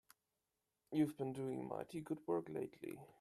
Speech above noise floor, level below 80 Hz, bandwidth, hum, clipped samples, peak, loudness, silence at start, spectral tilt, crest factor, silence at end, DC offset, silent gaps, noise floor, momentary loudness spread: 47 dB; -82 dBFS; 13.5 kHz; none; under 0.1%; -26 dBFS; -44 LUFS; 0.9 s; -7.5 dB/octave; 20 dB; 0.1 s; under 0.1%; none; -90 dBFS; 9 LU